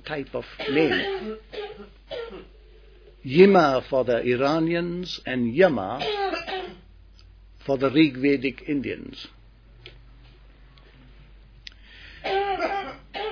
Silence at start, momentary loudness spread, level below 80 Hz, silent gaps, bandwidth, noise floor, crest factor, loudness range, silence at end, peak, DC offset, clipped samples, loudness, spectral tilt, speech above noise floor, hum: 0.05 s; 21 LU; -50 dBFS; none; 5.4 kHz; -50 dBFS; 24 dB; 12 LU; 0 s; -2 dBFS; under 0.1%; under 0.1%; -23 LUFS; -7 dB/octave; 28 dB; none